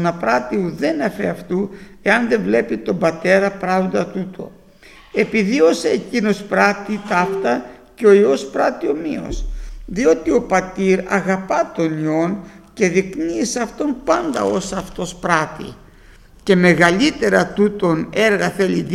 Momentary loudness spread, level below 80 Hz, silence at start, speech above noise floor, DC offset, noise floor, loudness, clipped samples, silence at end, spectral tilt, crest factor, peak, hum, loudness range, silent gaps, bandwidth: 12 LU; -40 dBFS; 0 s; 27 dB; under 0.1%; -44 dBFS; -18 LUFS; under 0.1%; 0 s; -5.5 dB/octave; 18 dB; 0 dBFS; none; 3 LU; none; 14 kHz